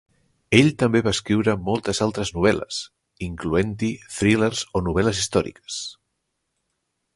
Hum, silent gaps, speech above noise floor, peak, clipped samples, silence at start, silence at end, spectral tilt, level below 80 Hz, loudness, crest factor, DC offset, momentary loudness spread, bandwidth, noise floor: none; none; 55 dB; 0 dBFS; under 0.1%; 0.5 s; 1.25 s; -5 dB/octave; -44 dBFS; -22 LUFS; 22 dB; under 0.1%; 13 LU; 11.5 kHz; -76 dBFS